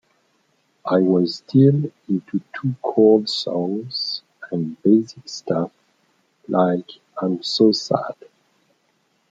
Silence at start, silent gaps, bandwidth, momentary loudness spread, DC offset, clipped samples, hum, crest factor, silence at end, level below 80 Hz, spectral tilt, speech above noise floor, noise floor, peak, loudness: 0.85 s; none; 7.8 kHz; 15 LU; under 0.1%; under 0.1%; none; 18 dB; 1.2 s; -70 dBFS; -7 dB/octave; 46 dB; -66 dBFS; -4 dBFS; -20 LUFS